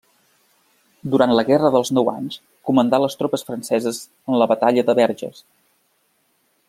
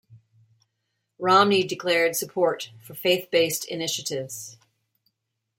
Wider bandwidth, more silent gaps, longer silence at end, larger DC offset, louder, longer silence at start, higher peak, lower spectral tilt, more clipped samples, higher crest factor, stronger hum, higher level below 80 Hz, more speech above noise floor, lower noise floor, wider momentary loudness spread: about the same, 15.5 kHz vs 16.5 kHz; neither; first, 1.4 s vs 1.05 s; neither; first, -19 LUFS vs -23 LUFS; first, 1.05 s vs 0.1 s; first, 0 dBFS vs -4 dBFS; first, -5.5 dB/octave vs -3 dB/octave; neither; about the same, 20 dB vs 20 dB; neither; first, -64 dBFS vs -74 dBFS; second, 46 dB vs 56 dB; second, -65 dBFS vs -79 dBFS; about the same, 14 LU vs 16 LU